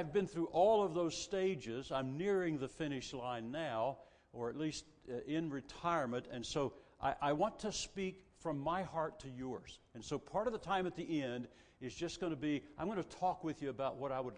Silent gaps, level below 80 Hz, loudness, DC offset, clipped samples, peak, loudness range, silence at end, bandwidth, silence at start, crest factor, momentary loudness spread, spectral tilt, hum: none; -66 dBFS; -40 LUFS; under 0.1%; under 0.1%; -20 dBFS; 5 LU; 0 s; 10 kHz; 0 s; 18 dB; 10 LU; -5 dB/octave; none